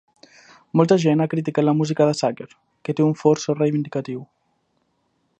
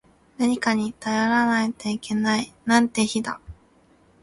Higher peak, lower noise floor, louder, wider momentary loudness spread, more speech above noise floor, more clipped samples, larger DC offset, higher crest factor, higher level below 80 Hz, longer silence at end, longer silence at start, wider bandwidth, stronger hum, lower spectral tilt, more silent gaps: about the same, -2 dBFS vs -4 dBFS; first, -69 dBFS vs -58 dBFS; first, -20 LUFS vs -23 LUFS; first, 16 LU vs 8 LU; first, 49 dB vs 35 dB; neither; neither; about the same, 20 dB vs 20 dB; second, -68 dBFS vs -56 dBFS; first, 1.15 s vs 0.7 s; first, 0.75 s vs 0.4 s; second, 9 kHz vs 11.5 kHz; neither; first, -7 dB/octave vs -4 dB/octave; neither